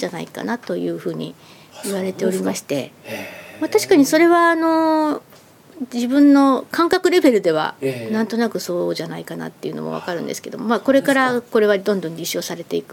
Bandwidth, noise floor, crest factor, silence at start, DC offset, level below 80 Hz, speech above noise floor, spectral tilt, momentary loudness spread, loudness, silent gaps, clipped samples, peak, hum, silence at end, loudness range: 17 kHz; -47 dBFS; 18 dB; 0 s; under 0.1%; -66 dBFS; 28 dB; -4.5 dB/octave; 16 LU; -18 LUFS; none; under 0.1%; 0 dBFS; none; 0.1 s; 8 LU